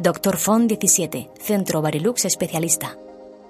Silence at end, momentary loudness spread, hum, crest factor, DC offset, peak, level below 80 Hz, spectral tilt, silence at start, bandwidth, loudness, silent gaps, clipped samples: 0 s; 8 LU; none; 20 dB; under 0.1%; -2 dBFS; -58 dBFS; -4 dB/octave; 0 s; 15.5 kHz; -20 LUFS; none; under 0.1%